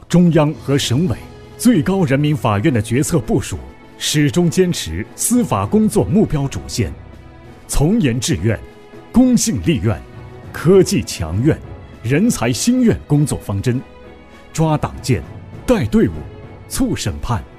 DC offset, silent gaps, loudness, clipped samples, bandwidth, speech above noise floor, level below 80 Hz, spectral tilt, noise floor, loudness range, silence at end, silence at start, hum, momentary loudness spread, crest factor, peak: 0.3%; none; -17 LUFS; under 0.1%; 15.5 kHz; 24 dB; -34 dBFS; -5.5 dB/octave; -39 dBFS; 3 LU; 0.05 s; 0.1 s; none; 13 LU; 14 dB; -2 dBFS